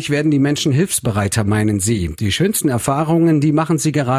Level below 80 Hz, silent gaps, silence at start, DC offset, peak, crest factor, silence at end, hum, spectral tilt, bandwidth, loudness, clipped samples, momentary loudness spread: -38 dBFS; none; 0 s; under 0.1%; -4 dBFS; 12 dB; 0 s; none; -5 dB/octave; 16 kHz; -16 LUFS; under 0.1%; 4 LU